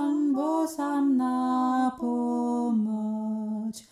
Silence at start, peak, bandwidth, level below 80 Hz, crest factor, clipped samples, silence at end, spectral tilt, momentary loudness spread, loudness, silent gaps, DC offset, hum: 0 s; -16 dBFS; 14 kHz; -72 dBFS; 10 dB; under 0.1%; 0.1 s; -6.5 dB/octave; 6 LU; -27 LUFS; none; under 0.1%; none